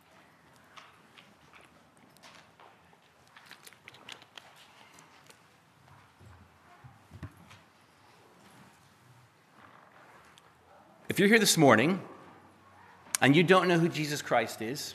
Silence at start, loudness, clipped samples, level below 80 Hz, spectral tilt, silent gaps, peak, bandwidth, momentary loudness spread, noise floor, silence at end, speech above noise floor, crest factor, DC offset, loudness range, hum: 7.15 s; -25 LUFS; under 0.1%; -74 dBFS; -4 dB/octave; none; -4 dBFS; 15 kHz; 29 LU; -61 dBFS; 0 s; 36 dB; 28 dB; under 0.1%; 27 LU; none